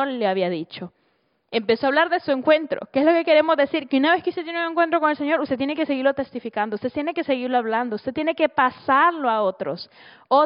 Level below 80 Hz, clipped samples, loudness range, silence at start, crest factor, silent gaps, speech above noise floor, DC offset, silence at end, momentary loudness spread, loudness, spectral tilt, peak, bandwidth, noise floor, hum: -66 dBFS; under 0.1%; 3 LU; 0 s; 16 dB; none; 46 dB; under 0.1%; 0 s; 10 LU; -21 LUFS; -2.5 dB/octave; -6 dBFS; 5.4 kHz; -67 dBFS; none